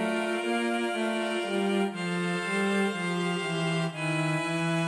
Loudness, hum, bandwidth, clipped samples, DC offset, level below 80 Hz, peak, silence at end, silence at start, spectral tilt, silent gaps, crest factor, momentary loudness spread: -28 LUFS; none; 11 kHz; under 0.1%; under 0.1%; -74 dBFS; -16 dBFS; 0 s; 0 s; -5.5 dB/octave; none; 12 dB; 2 LU